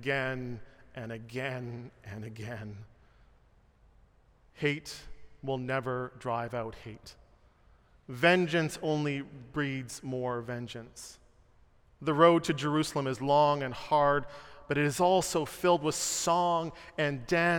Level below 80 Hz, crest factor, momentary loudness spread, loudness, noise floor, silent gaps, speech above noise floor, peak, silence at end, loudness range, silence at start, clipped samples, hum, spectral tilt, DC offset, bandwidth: -60 dBFS; 22 dB; 20 LU; -30 LUFS; -63 dBFS; none; 33 dB; -10 dBFS; 0 s; 13 LU; 0 s; under 0.1%; none; -4.5 dB/octave; under 0.1%; 17 kHz